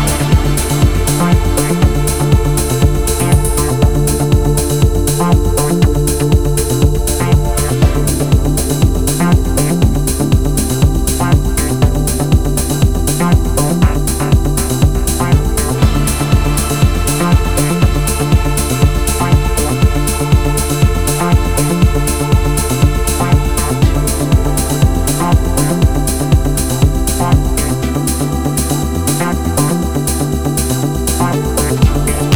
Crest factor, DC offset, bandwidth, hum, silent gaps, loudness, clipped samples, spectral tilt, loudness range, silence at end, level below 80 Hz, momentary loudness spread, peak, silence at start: 12 dB; 2%; over 20 kHz; none; none; -13 LUFS; under 0.1%; -5.5 dB/octave; 2 LU; 0 s; -16 dBFS; 3 LU; 0 dBFS; 0 s